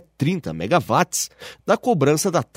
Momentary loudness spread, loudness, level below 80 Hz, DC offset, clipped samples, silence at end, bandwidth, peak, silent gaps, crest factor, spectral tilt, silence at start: 8 LU; -21 LUFS; -56 dBFS; under 0.1%; under 0.1%; 0.15 s; 16 kHz; -4 dBFS; none; 18 dB; -5 dB/octave; 0.2 s